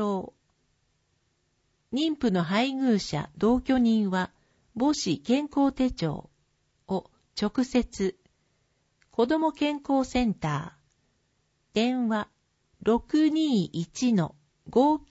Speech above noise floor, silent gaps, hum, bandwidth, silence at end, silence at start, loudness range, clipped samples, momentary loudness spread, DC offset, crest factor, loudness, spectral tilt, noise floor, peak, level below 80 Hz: 47 dB; none; none; 8 kHz; 0.1 s; 0 s; 4 LU; under 0.1%; 11 LU; under 0.1%; 18 dB; -27 LUFS; -6 dB/octave; -72 dBFS; -10 dBFS; -52 dBFS